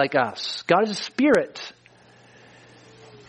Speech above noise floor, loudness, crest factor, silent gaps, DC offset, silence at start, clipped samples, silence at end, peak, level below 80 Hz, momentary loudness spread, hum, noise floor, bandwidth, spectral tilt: 31 dB; -22 LUFS; 22 dB; none; under 0.1%; 0 s; under 0.1%; 0.15 s; -4 dBFS; -68 dBFS; 15 LU; none; -53 dBFS; 10 kHz; -4.5 dB/octave